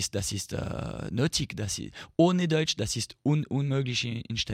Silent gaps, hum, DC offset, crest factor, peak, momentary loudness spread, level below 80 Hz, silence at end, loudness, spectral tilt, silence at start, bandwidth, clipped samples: none; none; under 0.1%; 18 dB; -10 dBFS; 9 LU; -52 dBFS; 0 s; -29 LUFS; -4.5 dB/octave; 0 s; 16 kHz; under 0.1%